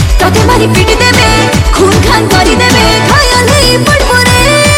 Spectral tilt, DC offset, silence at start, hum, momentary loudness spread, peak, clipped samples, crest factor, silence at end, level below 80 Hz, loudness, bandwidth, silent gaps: -4 dB/octave; under 0.1%; 0 s; none; 2 LU; 0 dBFS; 0.3%; 6 dB; 0 s; -14 dBFS; -6 LUFS; 18 kHz; none